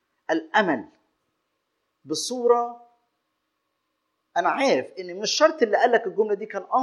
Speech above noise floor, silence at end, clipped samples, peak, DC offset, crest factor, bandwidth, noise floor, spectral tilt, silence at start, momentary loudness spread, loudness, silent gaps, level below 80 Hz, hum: 54 dB; 0 s; under 0.1%; -4 dBFS; under 0.1%; 22 dB; 12.5 kHz; -77 dBFS; -3 dB/octave; 0.3 s; 10 LU; -23 LUFS; none; -82 dBFS; none